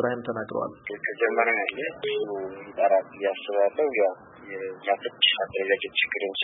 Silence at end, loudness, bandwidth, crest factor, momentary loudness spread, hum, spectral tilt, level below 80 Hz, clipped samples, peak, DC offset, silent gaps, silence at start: 0 s; -26 LUFS; 4 kHz; 18 dB; 12 LU; none; -7.5 dB/octave; -70 dBFS; under 0.1%; -8 dBFS; under 0.1%; none; 0 s